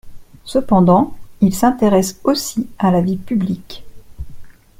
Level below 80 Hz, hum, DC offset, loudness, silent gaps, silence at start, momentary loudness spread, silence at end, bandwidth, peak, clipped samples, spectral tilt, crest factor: -40 dBFS; none; under 0.1%; -16 LUFS; none; 0.05 s; 24 LU; 0.3 s; 16.5 kHz; 0 dBFS; under 0.1%; -6.5 dB/octave; 16 dB